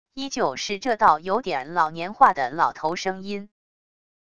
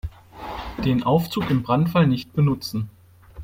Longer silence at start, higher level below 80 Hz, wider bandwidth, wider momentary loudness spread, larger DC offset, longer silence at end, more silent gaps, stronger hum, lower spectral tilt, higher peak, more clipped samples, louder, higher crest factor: about the same, 0.15 s vs 0.05 s; second, -60 dBFS vs -42 dBFS; second, 10 kHz vs 16.5 kHz; second, 12 LU vs 16 LU; first, 0.4% vs under 0.1%; first, 0.75 s vs 0 s; neither; neither; second, -3.5 dB/octave vs -7.5 dB/octave; first, -2 dBFS vs -6 dBFS; neither; about the same, -23 LUFS vs -22 LUFS; first, 22 dB vs 16 dB